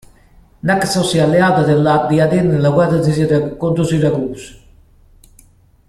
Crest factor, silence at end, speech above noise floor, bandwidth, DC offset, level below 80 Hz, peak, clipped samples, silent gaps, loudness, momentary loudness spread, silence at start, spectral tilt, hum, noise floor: 14 dB; 1.3 s; 35 dB; 13.5 kHz; under 0.1%; -44 dBFS; -2 dBFS; under 0.1%; none; -14 LUFS; 6 LU; 0.65 s; -6.5 dB/octave; none; -48 dBFS